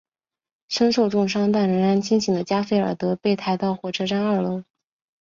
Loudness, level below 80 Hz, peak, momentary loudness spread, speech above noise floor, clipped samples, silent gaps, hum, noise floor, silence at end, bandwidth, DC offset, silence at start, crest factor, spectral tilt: -22 LUFS; -62 dBFS; -6 dBFS; 6 LU; over 69 dB; under 0.1%; none; none; under -90 dBFS; 0.6 s; 7.6 kHz; under 0.1%; 0.7 s; 16 dB; -6 dB/octave